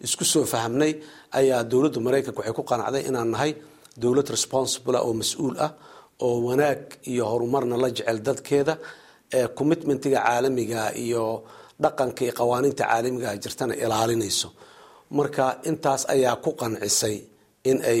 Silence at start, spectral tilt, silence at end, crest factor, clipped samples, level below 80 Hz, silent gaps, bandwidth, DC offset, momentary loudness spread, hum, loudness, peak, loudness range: 0 s; -4 dB/octave; 0 s; 18 dB; under 0.1%; -62 dBFS; none; 16.5 kHz; under 0.1%; 7 LU; none; -24 LUFS; -6 dBFS; 1 LU